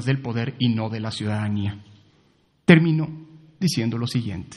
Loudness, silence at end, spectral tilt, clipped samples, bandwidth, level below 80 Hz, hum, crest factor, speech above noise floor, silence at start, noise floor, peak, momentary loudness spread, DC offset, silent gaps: -23 LUFS; 0 s; -6.5 dB/octave; under 0.1%; 12 kHz; -58 dBFS; none; 22 dB; 40 dB; 0 s; -61 dBFS; -2 dBFS; 13 LU; under 0.1%; none